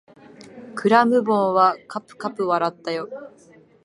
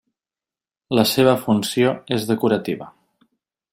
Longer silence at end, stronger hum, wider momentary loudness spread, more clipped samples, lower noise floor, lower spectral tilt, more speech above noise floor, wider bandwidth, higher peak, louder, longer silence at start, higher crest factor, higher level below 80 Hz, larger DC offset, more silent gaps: second, 0.55 s vs 0.85 s; neither; first, 18 LU vs 8 LU; neither; second, -45 dBFS vs under -90 dBFS; about the same, -6 dB/octave vs -5 dB/octave; second, 25 dB vs over 71 dB; second, 11.5 kHz vs 16.5 kHz; about the same, -2 dBFS vs -2 dBFS; about the same, -20 LUFS vs -19 LUFS; second, 0.4 s vs 0.9 s; about the same, 20 dB vs 18 dB; second, -74 dBFS vs -60 dBFS; neither; neither